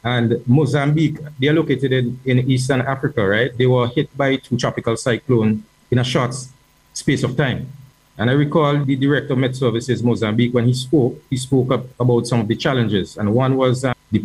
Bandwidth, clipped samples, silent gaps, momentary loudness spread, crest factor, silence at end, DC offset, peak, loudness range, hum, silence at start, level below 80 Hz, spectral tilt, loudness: 12 kHz; under 0.1%; none; 5 LU; 14 dB; 0 s; under 0.1%; -4 dBFS; 3 LU; none; 0.05 s; -50 dBFS; -6.5 dB/octave; -18 LUFS